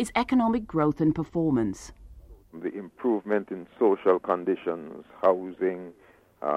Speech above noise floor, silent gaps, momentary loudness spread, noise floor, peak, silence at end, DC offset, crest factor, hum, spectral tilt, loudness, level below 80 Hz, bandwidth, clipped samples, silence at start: 22 dB; none; 14 LU; -48 dBFS; -8 dBFS; 0 s; under 0.1%; 18 dB; none; -7 dB/octave; -27 LUFS; -54 dBFS; 12.5 kHz; under 0.1%; 0 s